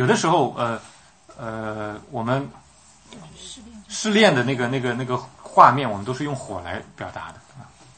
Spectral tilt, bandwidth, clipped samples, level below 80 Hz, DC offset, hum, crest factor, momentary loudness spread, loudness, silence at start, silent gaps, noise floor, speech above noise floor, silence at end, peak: -5 dB/octave; 8.8 kHz; under 0.1%; -58 dBFS; under 0.1%; none; 22 dB; 23 LU; -21 LUFS; 0 s; none; -51 dBFS; 30 dB; 0.3 s; 0 dBFS